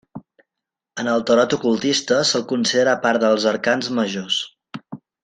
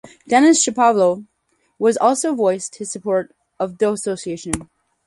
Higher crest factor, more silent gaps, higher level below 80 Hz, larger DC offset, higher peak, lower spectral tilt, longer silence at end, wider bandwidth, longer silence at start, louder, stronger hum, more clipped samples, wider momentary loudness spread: about the same, 18 dB vs 18 dB; neither; second, -64 dBFS vs -50 dBFS; neither; second, -4 dBFS vs 0 dBFS; about the same, -3.5 dB/octave vs -3.5 dB/octave; second, 0.3 s vs 0.45 s; second, 9.6 kHz vs 11.5 kHz; about the same, 0.15 s vs 0.05 s; about the same, -19 LUFS vs -18 LUFS; neither; neither; first, 17 LU vs 13 LU